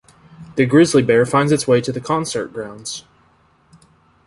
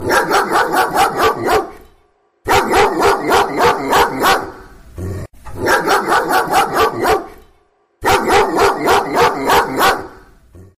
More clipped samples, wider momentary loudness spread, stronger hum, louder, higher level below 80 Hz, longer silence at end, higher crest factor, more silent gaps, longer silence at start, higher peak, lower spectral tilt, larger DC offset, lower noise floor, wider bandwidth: neither; first, 16 LU vs 11 LU; neither; about the same, -16 LUFS vs -14 LUFS; second, -54 dBFS vs -38 dBFS; first, 1.25 s vs 0.15 s; about the same, 16 dB vs 14 dB; neither; first, 0.4 s vs 0 s; about the same, -2 dBFS vs -2 dBFS; first, -5.5 dB/octave vs -3.5 dB/octave; neither; about the same, -56 dBFS vs -56 dBFS; second, 11.5 kHz vs 16 kHz